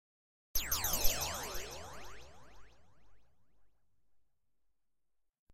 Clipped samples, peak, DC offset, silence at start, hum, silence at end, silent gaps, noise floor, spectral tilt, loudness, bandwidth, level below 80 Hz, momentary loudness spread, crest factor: under 0.1%; -14 dBFS; under 0.1%; 0.55 s; none; 1.85 s; none; under -90 dBFS; -1 dB/octave; -36 LUFS; 16 kHz; -48 dBFS; 19 LU; 26 dB